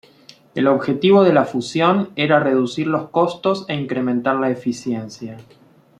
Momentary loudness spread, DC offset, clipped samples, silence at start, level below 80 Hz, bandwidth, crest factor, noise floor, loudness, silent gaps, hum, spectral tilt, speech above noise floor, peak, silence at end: 12 LU; under 0.1%; under 0.1%; 0.55 s; -64 dBFS; 10 kHz; 18 dB; -48 dBFS; -18 LUFS; none; none; -6.5 dB/octave; 30 dB; -2 dBFS; 0.6 s